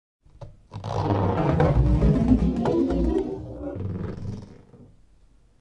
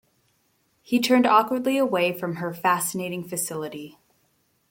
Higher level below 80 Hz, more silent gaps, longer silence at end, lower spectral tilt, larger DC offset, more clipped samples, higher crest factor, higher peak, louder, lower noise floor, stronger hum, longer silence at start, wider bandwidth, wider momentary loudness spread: first, -32 dBFS vs -70 dBFS; neither; about the same, 0.75 s vs 0.8 s; first, -9.5 dB/octave vs -4 dB/octave; neither; neither; about the same, 18 dB vs 20 dB; about the same, -6 dBFS vs -6 dBFS; about the same, -24 LUFS vs -23 LUFS; second, -55 dBFS vs -68 dBFS; neither; second, 0.4 s vs 0.9 s; second, 7.8 kHz vs 17 kHz; about the same, 15 LU vs 14 LU